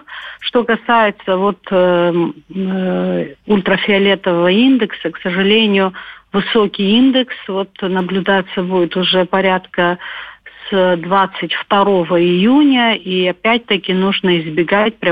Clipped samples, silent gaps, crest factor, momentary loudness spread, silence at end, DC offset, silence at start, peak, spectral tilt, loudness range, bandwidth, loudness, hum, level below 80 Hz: under 0.1%; none; 12 dB; 9 LU; 0 s; 0.1%; 0.1 s; -2 dBFS; -8.5 dB/octave; 2 LU; 5 kHz; -14 LUFS; none; -54 dBFS